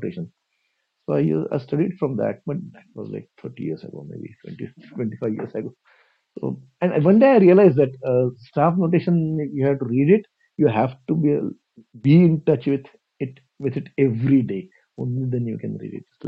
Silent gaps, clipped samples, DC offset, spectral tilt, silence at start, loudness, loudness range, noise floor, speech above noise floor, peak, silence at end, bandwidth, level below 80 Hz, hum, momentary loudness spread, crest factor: none; under 0.1%; under 0.1%; -11 dB/octave; 0 s; -20 LUFS; 14 LU; -72 dBFS; 52 dB; -2 dBFS; 0 s; 5.2 kHz; -60 dBFS; none; 21 LU; 18 dB